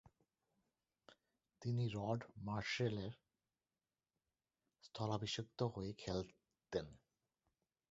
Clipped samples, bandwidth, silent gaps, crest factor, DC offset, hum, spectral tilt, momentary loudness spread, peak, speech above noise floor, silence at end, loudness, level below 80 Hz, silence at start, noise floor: under 0.1%; 7.6 kHz; none; 22 dB; under 0.1%; none; -5 dB/octave; 11 LU; -26 dBFS; over 47 dB; 0.95 s; -44 LUFS; -68 dBFS; 1.1 s; under -90 dBFS